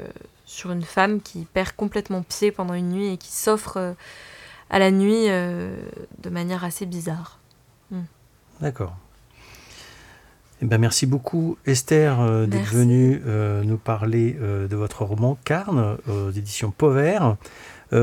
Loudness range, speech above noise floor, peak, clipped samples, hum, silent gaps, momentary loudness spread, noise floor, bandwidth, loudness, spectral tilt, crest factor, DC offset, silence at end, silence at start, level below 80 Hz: 11 LU; 34 dB; -4 dBFS; under 0.1%; none; none; 18 LU; -56 dBFS; 16.5 kHz; -22 LUFS; -6 dB/octave; 20 dB; under 0.1%; 0 s; 0 s; -52 dBFS